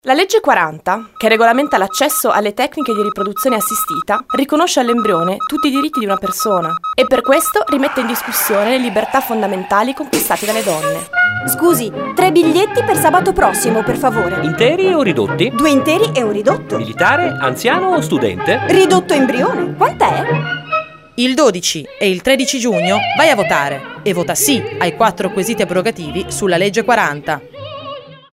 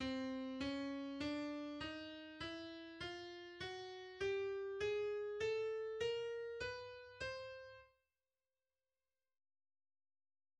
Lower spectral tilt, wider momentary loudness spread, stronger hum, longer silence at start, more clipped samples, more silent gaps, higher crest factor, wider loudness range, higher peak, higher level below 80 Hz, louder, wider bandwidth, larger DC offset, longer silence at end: about the same, -4 dB/octave vs -4.5 dB/octave; second, 7 LU vs 11 LU; neither; about the same, 0.05 s vs 0 s; neither; neither; about the same, 14 dB vs 16 dB; second, 2 LU vs 11 LU; first, 0 dBFS vs -30 dBFS; first, -46 dBFS vs -70 dBFS; first, -14 LUFS vs -45 LUFS; first, 16.5 kHz vs 10 kHz; neither; second, 0.2 s vs 2.7 s